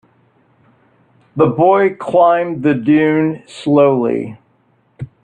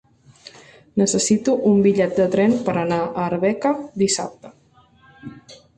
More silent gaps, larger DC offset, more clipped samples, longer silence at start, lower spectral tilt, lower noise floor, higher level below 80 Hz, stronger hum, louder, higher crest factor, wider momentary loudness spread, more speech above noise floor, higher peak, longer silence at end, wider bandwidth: neither; neither; neither; first, 1.35 s vs 0.95 s; first, -8 dB/octave vs -5 dB/octave; about the same, -57 dBFS vs -54 dBFS; about the same, -56 dBFS vs -56 dBFS; neither; first, -14 LUFS vs -19 LUFS; about the same, 14 dB vs 16 dB; about the same, 16 LU vs 17 LU; first, 44 dB vs 36 dB; first, 0 dBFS vs -6 dBFS; about the same, 0.2 s vs 0.2 s; second, 9.2 kHz vs 11.5 kHz